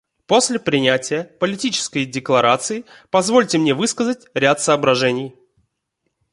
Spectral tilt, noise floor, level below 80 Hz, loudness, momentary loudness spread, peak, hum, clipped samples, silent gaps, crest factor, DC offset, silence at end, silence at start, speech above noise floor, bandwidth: -3.5 dB/octave; -74 dBFS; -62 dBFS; -18 LUFS; 8 LU; -2 dBFS; none; under 0.1%; none; 18 dB; under 0.1%; 1.05 s; 0.3 s; 56 dB; 11.5 kHz